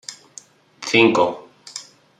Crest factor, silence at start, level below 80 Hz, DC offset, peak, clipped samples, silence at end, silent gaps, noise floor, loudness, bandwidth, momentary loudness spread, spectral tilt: 20 dB; 0.1 s; -68 dBFS; under 0.1%; 0 dBFS; under 0.1%; 0.35 s; none; -46 dBFS; -17 LUFS; 11 kHz; 22 LU; -4 dB/octave